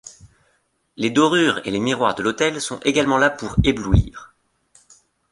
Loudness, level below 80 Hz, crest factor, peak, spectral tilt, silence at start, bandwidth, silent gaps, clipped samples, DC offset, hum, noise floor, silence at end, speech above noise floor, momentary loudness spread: -19 LUFS; -32 dBFS; 18 dB; -2 dBFS; -5 dB/octave; 0.05 s; 11.5 kHz; none; under 0.1%; under 0.1%; none; -66 dBFS; 1.05 s; 47 dB; 6 LU